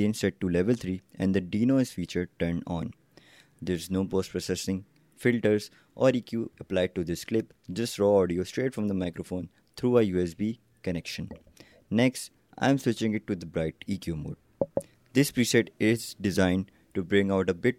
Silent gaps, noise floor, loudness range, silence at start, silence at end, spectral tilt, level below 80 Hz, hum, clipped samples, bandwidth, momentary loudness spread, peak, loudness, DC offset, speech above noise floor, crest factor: none; -57 dBFS; 3 LU; 0 s; 0.05 s; -6 dB/octave; -60 dBFS; none; under 0.1%; 16 kHz; 12 LU; -8 dBFS; -28 LUFS; under 0.1%; 30 dB; 20 dB